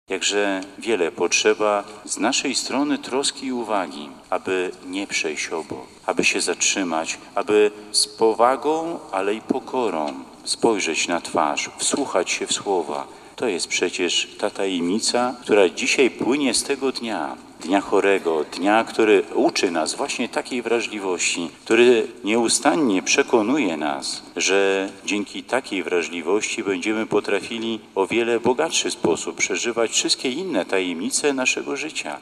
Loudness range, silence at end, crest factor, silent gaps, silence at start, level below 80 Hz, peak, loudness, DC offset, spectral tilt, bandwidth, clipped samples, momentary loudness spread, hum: 4 LU; 0 s; 20 dB; none; 0.1 s; -64 dBFS; -2 dBFS; -21 LUFS; under 0.1%; -2 dB/octave; 13.5 kHz; under 0.1%; 9 LU; none